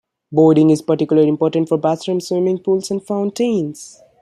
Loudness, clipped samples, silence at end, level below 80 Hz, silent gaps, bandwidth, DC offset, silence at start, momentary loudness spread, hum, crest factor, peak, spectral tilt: -16 LUFS; under 0.1%; 0.35 s; -64 dBFS; none; 12.5 kHz; under 0.1%; 0.3 s; 9 LU; none; 14 dB; -2 dBFS; -7 dB/octave